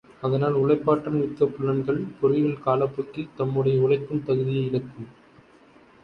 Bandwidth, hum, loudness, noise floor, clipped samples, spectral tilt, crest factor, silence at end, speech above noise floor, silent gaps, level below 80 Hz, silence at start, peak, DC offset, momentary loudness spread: 5.4 kHz; none; -24 LUFS; -54 dBFS; under 0.1%; -10 dB/octave; 18 dB; 0.95 s; 30 dB; none; -60 dBFS; 0.2 s; -6 dBFS; under 0.1%; 9 LU